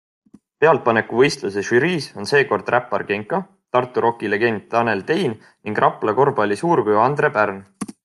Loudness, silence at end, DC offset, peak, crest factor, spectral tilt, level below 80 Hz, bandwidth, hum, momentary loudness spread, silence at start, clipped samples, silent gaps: -19 LUFS; 0.15 s; under 0.1%; -2 dBFS; 18 dB; -5.5 dB/octave; -64 dBFS; 12 kHz; none; 8 LU; 0.6 s; under 0.1%; none